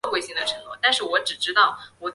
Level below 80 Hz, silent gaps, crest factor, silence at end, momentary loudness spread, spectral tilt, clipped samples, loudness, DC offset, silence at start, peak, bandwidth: -66 dBFS; none; 20 dB; 0 s; 8 LU; -0.5 dB/octave; under 0.1%; -22 LUFS; under 0.1%; 0.05 s; -4 dBFS; 11.5 kHz